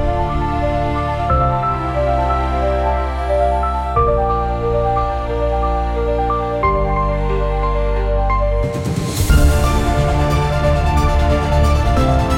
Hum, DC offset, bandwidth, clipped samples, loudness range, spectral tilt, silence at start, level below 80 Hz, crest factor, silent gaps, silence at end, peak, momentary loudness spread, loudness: none; under 0.1%; 17 kHz; under 0.1%; 2 LU; -6.5 dB/octave; 0 s; -20 dBFS; 14 dB; none; 0 s; -2 dBFS; 4 LU; -17 LUFS